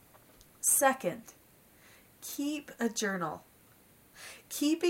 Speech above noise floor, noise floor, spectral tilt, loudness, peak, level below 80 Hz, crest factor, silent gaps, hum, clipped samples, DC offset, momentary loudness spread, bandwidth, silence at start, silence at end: 30 dB; -61 dBFS; -2.5 dB/octave; -31 LUFS; -12 dBFS; -74 dBFS; 22 dB; none; none; under 0.1%; under 0.1%; 22 LU; 16 kHz; 0.6 s; 0 s